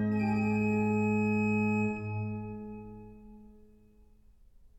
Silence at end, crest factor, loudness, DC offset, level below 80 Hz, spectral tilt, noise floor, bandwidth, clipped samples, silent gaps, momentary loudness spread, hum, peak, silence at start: 0.1 s; 14 dB; -30 LUFS; under 0.1%; -58 dBFS; -9 dB/octave; -59 dBFS; 8 kHz; under 0.1%; none; 18 LU; none; -20 dBFS; 0 s